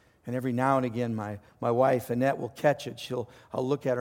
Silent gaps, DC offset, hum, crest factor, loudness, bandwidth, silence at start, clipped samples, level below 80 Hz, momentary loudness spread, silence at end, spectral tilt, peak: none; under 0.1%; none; 18 dB; -29 LUFS; 17 kHz; 0.25 s; under 0.1%; -66 dBFS; 10 LU; 0 s; -7 dB/octave; -10 dBFS